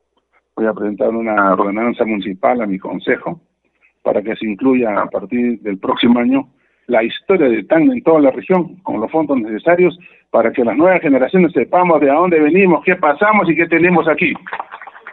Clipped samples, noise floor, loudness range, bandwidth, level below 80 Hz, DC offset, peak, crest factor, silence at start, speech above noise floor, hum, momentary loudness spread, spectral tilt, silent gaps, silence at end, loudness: under 0.1%; -61 dBFS; 6 LU; 4.1 kHz; -58 dBFS; under 0.1%; 0 dBFS; 14 dB; 0.55 s; 47 dB; none; 9 LU; -10.5 dB/octave; none; 0 s; -14 LUFS